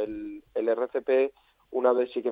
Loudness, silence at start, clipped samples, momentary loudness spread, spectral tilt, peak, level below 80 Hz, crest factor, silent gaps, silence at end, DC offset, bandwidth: -27 LUFS; 0 s; under 0.1%; 10 LU; -7.5 dB/octave; -10 dBFS; -64 dBFS; 18 dB; none; 0 s; under 0.1%; 4.8 kHz